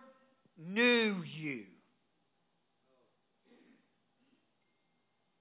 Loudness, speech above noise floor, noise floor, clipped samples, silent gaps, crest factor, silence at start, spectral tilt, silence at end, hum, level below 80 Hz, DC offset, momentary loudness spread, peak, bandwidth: -32 LUFS; 47 dB; -80 dBFS; under 0.1%; none; 22 dB; 0.6 s; -3 dB/octave; 3.75 s; none; under -90 dBFS; under 0.1%; 18 LU; -16 dBFS; 4 kHz